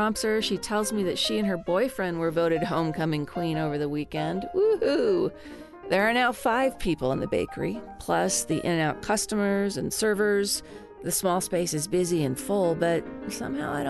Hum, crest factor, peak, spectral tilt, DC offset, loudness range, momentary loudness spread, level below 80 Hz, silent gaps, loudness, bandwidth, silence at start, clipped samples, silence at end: none; 18 dB; -8 dBFS; -4.5 dB/octave; under 0.1%; 1 LU; 7 LU; -52 dBFS; none; -26 LUFS; 12.5 kHz; 0 s; under 0.1%; 0 s